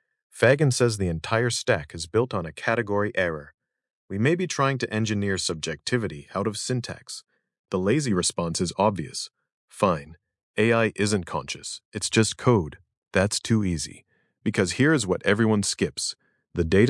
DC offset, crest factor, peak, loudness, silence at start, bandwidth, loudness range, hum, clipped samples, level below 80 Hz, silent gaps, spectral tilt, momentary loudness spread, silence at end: under 0.1%; 22 dB; -4 dBFS; -25 LUFS; 0.35 s; 12 kHz; 3 LU; none; under 0.1%; -56 dBFS; 3.54-3.58 s, 3.95-4.08 s, 7.59-7.64 s, 9.52-9.68 s, 10.43-10.54 s, 11.85-11.92 s, 12.97-13.02 s; -4.5 dB/octave; 12 LU; 0 s